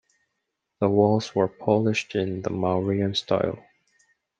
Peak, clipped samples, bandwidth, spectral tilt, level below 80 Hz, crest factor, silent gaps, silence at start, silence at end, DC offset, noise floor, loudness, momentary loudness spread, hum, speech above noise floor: -6 dBFS; under 0.1%; 9.2 kHz; -6.5 dB/octave; -64 dBFS; 18 dB; none; 0.8 s; 0.8 s; under 0.1%; -80 dBFS; -24 LUFS; 7 LU; none; 57 dB